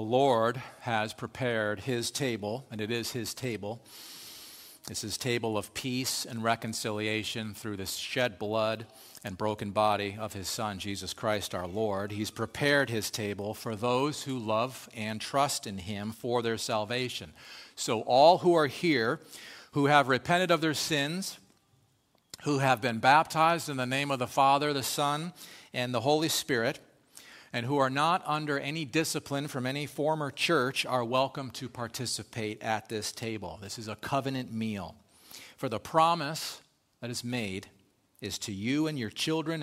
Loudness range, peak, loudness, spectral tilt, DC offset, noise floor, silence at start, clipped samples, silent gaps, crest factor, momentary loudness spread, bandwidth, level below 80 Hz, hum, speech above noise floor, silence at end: 8 LU; -8 dBFS; -30 LUFS; -4 dB/octave; under 0.1%; -69 dBFS; 0 s; under 0.1%; none; 24 dB; 14 LU; 16 kHz; -66 dBFS; none; 39 dB; 0 s